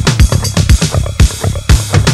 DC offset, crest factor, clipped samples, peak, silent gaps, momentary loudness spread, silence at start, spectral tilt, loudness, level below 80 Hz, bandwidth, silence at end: under 0.1%; 10 dB; 0.5%; 0 dBFS; none; 3 LU; 0 s; -4.5 dB/octave; -11 LUFS; -14 dBFS; 14.5 kHz; 0 s